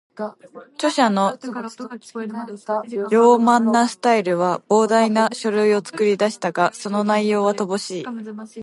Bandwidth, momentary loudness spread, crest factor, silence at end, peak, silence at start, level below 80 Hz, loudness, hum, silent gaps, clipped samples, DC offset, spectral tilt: 11.5 kHz; 16 LU; 18 dB; 0 s; -2 dBFS; 0.15 s; -72 dBFS; -19 LUFS; none; none; under 0.1%; under 0.1%; -5 dB/octave